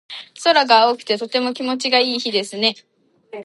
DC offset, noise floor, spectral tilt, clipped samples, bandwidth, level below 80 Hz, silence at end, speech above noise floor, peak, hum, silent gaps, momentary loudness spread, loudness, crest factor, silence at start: under 0.1%; -39 dBFS; -2.5 dB/octave; under 0.1%; 11.5 kHz; -78 dBFS; 0 s; 21 dB; 0 dBFS; none; none; 11 LU; -17 LUFS; 20 dB; 0.1 s